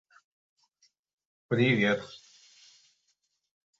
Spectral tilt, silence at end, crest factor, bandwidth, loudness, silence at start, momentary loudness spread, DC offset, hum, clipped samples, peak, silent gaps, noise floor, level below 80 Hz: -6.5 dB/octave; 1.65 s; 22 dB; 7.8 kHz; -27 LUFS; 1.5 s; 23 LU; under 0.1%; none; under 0.1%; -12 dBFS; none; -77 dBFS; -72 dBFS